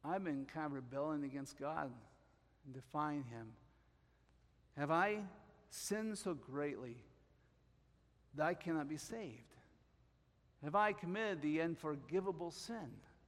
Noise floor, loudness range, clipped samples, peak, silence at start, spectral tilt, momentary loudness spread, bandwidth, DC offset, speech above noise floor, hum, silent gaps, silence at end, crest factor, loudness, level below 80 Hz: -73 dBFS; 6 LU; under 0.1%; -22 dBFS; 0.05 s; -5.5 dB/octave; 17 LU; 16 kHz; under 0.1%; 31 dB; none; none; 0.15 s; 22 dB; -42 LUFS; -74 dBFS